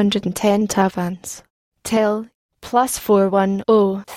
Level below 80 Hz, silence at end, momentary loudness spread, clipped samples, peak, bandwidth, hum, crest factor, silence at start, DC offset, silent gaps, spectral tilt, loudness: -52 dBFS; 0 s; 13 LU; under 0.1%; -4 dBFS; 16.5 kHz; none; 16 dB; 0 s; under 0.1%; 1.50-1.72 s, 2.34-2.49 s; -5 dB/octave; -18 LUFS